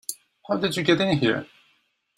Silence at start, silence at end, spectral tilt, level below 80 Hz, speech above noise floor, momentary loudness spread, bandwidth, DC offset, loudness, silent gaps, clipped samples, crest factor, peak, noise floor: 0.1 s; 0.7 s; -5 dB/octave; -62 dBFS; 45 dB; 13 LU; 16 kHz; under 0.1%; -23 LUFS; none; under 0.1%; 22 dB; -4 dBFS; -67 dBFS